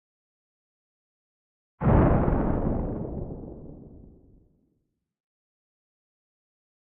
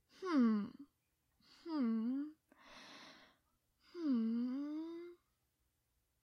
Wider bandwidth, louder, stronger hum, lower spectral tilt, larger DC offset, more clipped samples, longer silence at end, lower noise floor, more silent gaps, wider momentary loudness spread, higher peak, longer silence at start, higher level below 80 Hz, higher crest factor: second, 3.5 kHz vs 6.6 kHz; first, -26 LUFS vs -39 LUFS; neither; first, -10.5 dB/octave vs -7 dB/octave; neither; neither; first, 3 s vs 1.1 s; second, -76 dBFS vs -83 dBFS; neither; about the same, 23 LU vs 22 LU; first, -8 dBFS vs -26 dBFS; first, 1.8 s vs 0.2 s; first, -36 dBFS vs -86 dBFS; first, 22 dB vs 16 dB